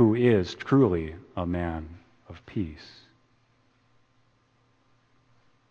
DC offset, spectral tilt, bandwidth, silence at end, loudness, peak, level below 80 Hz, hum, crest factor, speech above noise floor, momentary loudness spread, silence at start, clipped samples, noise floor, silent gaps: under 0.1%; -8.5 dB/octave; 7.2 kHz; 2.85 s; -27 LUFS; -8 dBFS; -50 dBFS; none; 20 dB; 40 dB; 25 LU; 0 s; under 0.1%; -66 dBFS; none